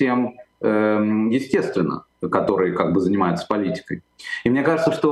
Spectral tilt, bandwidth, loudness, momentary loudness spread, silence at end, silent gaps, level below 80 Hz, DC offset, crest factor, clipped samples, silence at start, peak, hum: -7 dB/octave; 12.5 kHz; -21 LUFS; 10 LU; 0 s; none; -58 dBFS; under 0.1%; 18 dB; under 0.1%; 0 s; -4 dBFS; none